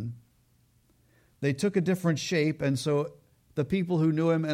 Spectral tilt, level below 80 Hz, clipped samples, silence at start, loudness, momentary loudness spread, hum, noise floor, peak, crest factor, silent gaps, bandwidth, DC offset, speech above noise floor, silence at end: -6.5 dB/octave; -62 dBFS; under 0.1%; 0 s; -28 LUFS; 8 LU; none; -65 dBFS; -14 dBFS; 16 dB; none; 15 kHz; under 0.1%; 39 dB; 0 s